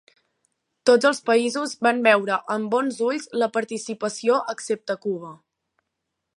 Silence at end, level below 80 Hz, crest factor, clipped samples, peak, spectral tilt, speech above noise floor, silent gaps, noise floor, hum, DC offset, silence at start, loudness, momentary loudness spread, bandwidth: 1 s; -78 dBFS; 20 dB; under 0.1%; -2 dBFS; -3.5 dB/octave; 58 dB; none; -80 dBFS; none; under 0.1%; 0.85 s; -22 LUFS; 10 LU; 11.5 kHz